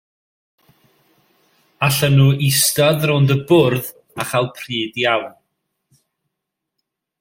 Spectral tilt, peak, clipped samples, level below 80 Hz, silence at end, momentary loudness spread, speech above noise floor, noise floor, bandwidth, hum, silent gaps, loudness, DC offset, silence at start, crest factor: -4.5 dB/octave; 0 dBFS; under 0.1%; -56 dBFS; 1.9 s; 10 LU; 64 dB; -80 dBFS; 16.5 kHz; none; none; -16 LUFS; under 0.1%; 1.8 s; 18 dB